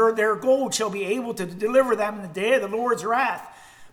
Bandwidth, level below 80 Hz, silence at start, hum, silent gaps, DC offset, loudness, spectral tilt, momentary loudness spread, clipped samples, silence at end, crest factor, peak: 16 kHz; -64 dBFS; 0 s; none; none; under 0.1%; -23 LUFS; -3.5 dB/octave; 7 LU; under 0.1%; 0.05 s; 16 dB; -6 dBFS